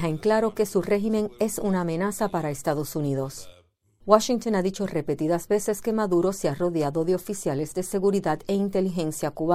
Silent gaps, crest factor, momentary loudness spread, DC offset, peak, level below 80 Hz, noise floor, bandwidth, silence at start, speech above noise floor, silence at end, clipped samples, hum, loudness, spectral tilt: none; 22 dB; 5 LU; under 0.1%; -2 dBFS; -54 dBFS; -58 dBFS; 16 kHz; 0 s; 34 dB; 0 s; under 0.1%; none; -25 LUFS; -6 dB/octave